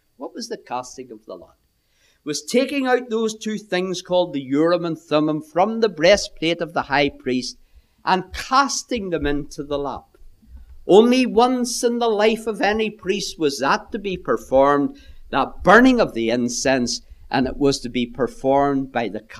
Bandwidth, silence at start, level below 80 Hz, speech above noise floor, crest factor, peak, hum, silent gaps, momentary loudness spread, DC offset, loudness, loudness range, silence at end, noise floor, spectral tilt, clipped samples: 14 kHz; 0.2 s; -42 dBFS; 42 dB; 20 dB; 0 dBFS; none; none; 13 LU; under 0.1%; -20 LUFS; 6 LU; 0 s; -62 dBFS; -4 dB/octave; under 0.1%